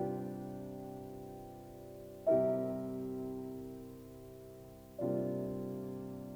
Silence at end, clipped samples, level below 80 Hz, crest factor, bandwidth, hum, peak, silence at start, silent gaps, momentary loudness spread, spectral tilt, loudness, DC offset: 0 s; under 0.1%; -64 dBFS; 20 dB; over 20 kHz; none; -20 dBFS; 0 s; none; 19 LU; -9 dB/octave; -39 LUFS; under 0.1%